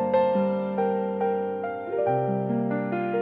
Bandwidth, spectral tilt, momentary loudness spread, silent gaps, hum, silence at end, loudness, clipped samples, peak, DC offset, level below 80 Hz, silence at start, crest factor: 5 kHz; -10.5 dB/octave; 6 LU; none; none; 0 s; -26 LUFS; under 0.1%; -12 dBFS; under 0.1%; -68 dBFS; 0 s; 14 dB